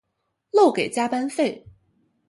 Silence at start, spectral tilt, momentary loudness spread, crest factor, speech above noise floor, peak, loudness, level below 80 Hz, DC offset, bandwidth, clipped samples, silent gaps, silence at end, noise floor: 0.55 s; -4.5 dB/octave; 8 LU; 18 dB; 56 dB; -6 dBFS; -22 LUFS; -66 dBFS; under 0.1%; 11.5 kHz; under 0.1%; none; 0.7 s; -76 dBFS